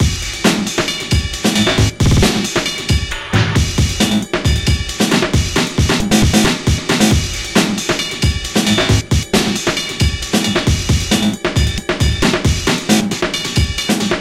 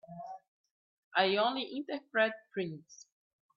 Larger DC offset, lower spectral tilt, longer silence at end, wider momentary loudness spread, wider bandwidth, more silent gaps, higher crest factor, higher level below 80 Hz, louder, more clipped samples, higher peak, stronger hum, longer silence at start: neither; first, -4 dB/octave vs -1.5 dB/octave; second, 0 s vs 0.6 s; second, 4 LU vs 19 LU; first, 16 kHz vs 7.4 kHz; second, none vs 0.48-0.64 s, 0.71-1.11 s; second, 14 dB vs 22 dB; first, -24 dBFS vs -84 dBFS; first, -15 LUFS vs -33 LUFS; neither; first, 0 dBFS vs -14 dBFS; neither; about the same, 0 s vs 0.1 s